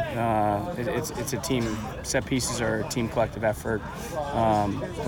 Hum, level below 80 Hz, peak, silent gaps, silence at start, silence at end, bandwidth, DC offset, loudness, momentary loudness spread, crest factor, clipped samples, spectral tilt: none; -44 dBFS; -10 dBFS; none; 0 s; 0 s; 19.5 kHz; under 0.1%; -27 LUFS; 7 LU; 16 dB; under 0.1%; -5 dB/octave